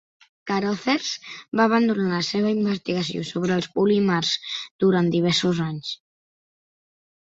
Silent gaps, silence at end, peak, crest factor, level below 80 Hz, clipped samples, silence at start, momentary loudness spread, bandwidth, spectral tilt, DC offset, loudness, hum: 4.71-4.79 s; 1.35 s; -6 dBFS; 16 dB; -62 dBFS; under 0.1%; 0.45 s; 10 LU; 8 kHz; -5.5 dB/octave; under 0.1%; -23 LUFS; none